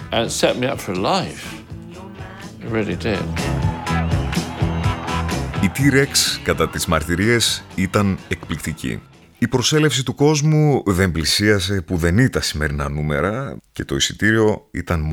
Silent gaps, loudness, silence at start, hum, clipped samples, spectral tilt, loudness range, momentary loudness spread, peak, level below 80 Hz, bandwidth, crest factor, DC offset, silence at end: none; -19 LUFS; 0 s; none; under 0.1%; -4.5 dB/octave; 6 LU; 13 LU; -2 dBFS; -34 dBFS; 18.5 kHz; 16 dB; under 0.1%; 0 s